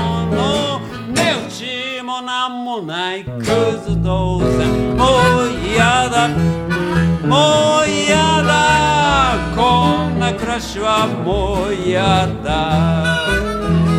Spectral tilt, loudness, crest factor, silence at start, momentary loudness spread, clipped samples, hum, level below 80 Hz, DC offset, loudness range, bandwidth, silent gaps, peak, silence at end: -5 dB/octave; -16 LUFS; 14 dB; 0 s; 9 LU; under 0.1%; none; -30 dBFS; under 0.1%; 6 LU; 14 kHz; none; 0 dBFS; 0 s